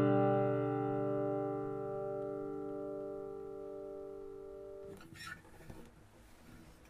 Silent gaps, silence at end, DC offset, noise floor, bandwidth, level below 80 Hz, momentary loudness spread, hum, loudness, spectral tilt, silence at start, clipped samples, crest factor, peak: none; 0 s; under 0.1%; -60 dBFS; 13.5 kHz; -66 dBFS; 22 LU; none; -39 LUFS; -8.5 dB/octave; 0 s; under 0.1%; 20 dB; -20 dBFS